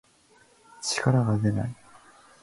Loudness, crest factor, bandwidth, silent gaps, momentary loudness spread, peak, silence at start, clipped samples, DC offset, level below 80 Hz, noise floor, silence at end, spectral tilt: -26 LUFS; 20 dB; 11.5 kHz; none; 12 LU; -8 dBFS; 0.8 s; under 0.1%; under 0.1%; -54 dBFS; -60 dBFS; 0.7 s; -5.5 dB/octave